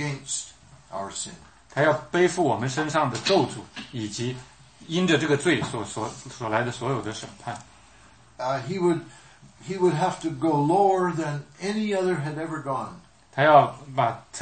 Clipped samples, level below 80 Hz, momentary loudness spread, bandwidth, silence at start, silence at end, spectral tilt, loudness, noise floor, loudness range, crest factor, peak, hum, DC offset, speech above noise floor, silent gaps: under 0.1%; -60 dBFS; 15 LU; 8.8 kHz; 0 s; 0 s; -5 dB/octave; -25 LUFS; -53 dBFS; 5 LU; 22 dB; -4 dBFS; none; under 0.1%; 29 dB; none